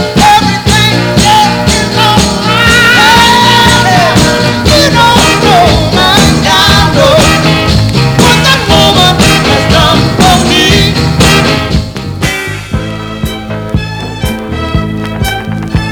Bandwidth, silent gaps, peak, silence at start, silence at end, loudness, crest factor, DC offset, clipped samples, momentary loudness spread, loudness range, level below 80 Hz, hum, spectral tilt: over 20 kHz; none; 0 dBFS; 0 s; 0 s; -6 LUFS; 6 dB; under 0.1%; 3%; 12 LU; 10 LU; -20 dBFS; none; -4 dB/octave